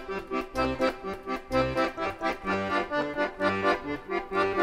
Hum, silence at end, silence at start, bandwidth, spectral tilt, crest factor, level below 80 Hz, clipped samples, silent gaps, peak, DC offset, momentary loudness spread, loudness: none; 0 s; 0 s; 15.5 kHz; -5.5 dB/octave; 16 dB; -48 dBFS; under 0.1%; none; -12 dBFS; under 0.1%; 6 LU; -29 LUFS